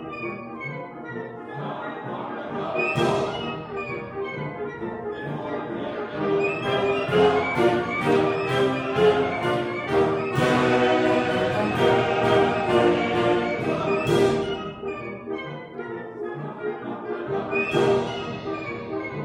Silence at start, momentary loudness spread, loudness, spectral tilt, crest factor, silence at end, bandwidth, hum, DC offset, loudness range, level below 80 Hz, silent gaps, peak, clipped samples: 0 s; 13 LU; -24 LUFS; -6 dB/octave; 16 dB; 0 s; 15.5 kHz; none; under 0.1%; 8 LU; -54 dBFS; none; -8 dBFS; under 0.1%